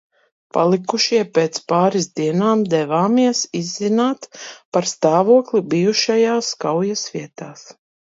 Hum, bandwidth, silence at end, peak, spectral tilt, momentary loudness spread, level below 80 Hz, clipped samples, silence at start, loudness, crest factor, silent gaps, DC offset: none; 7.8 kHz; 0.3 s; 0 dBFS; -4.5 dB/octave; 12 LU; -68 dBFS; under 0.1%; 0.55 s; -18 LUFS; 18 dB; 4.65-4.72 s; under 0.1%